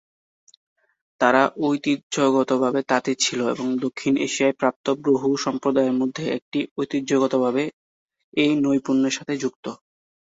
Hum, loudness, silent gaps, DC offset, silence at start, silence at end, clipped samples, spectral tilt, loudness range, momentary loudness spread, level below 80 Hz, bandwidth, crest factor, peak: none; -22 LUFS; 2.03-2.10 s, 4.76-4.84 s, 6.42-6.52 s, 6.71-6.76 s, 7.73-8.08 s, 8.24-8.32 s, 9.56-9.63 s; under 0.1%; 1.2 s; 0.6 s; under 0.1%; -4 dB/octave; 2 LU; 7 LU; -66 dBFS; 8 kHz; 20 dB; -4 dBFS